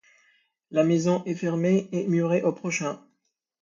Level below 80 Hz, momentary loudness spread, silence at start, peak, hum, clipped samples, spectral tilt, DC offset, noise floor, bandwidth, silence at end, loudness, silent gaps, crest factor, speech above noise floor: -72 dBFS; 7 LU; 0.7 s; -10 dBFS; none; under 0.1%; -6.5 dB/octave; under 0.1%; -76 dBFS; 7.6 kHz; 0.65 s; -25 LUFS; none; 16 dB; 52 dB